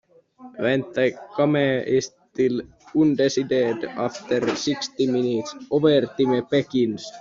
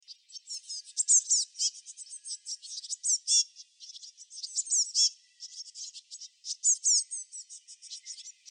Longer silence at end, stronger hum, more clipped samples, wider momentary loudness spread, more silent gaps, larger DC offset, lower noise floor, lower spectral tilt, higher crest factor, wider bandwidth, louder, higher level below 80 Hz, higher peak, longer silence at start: second, 0 s vs 0.2 s; neither; neither; second, 8 LU vs 22 LU; neither; neither; second, -47 dBFS vs -51 dBFS; first, -5 dB/octave vs 12 dB/octave; about the same, 16 dB vs 20 dB; second, 7.6 kHz vs 10.5 kHz; first, -22 LUFS vs -27 LUFS; first, -62 dBFS vs under -90 dBFS; first, -6 dBFS vs -14 dBFS; first, 0.4 s vs 0.1 s